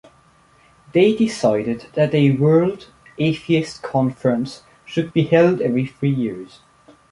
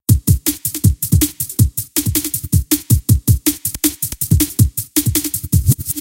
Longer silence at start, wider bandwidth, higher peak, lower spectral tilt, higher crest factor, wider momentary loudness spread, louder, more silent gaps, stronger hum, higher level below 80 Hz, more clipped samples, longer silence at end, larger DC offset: first, 0.95 s vs 0.1 s; second, 11.5 kHz vs 17.5 kHz; about the same, -2 dBFS vs 0 dBFS; first, -7.5 dB/octave vs -4.5 dB/octave; about the same, 16 dB vs 16 dB; first, 11 LU vs 4 LU; second, -19 LUFS vs -16 LUFS; neither; neither; second, -56 dBFS vs -26 dBFS; neither; first, 0.65 s vs 0 s; neither